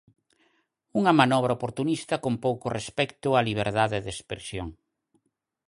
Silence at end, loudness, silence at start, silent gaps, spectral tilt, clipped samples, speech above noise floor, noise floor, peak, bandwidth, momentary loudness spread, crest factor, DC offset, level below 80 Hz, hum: 0.95 s; -26 LUFS; 0.95 s; none; -5.5 dB/octave; under 0.1%; 50 dB; -76 dBFS; -4 dBFS; 11.5 kHz; 15 LU; 24 dB; under 0.1%; -54 dBFS; none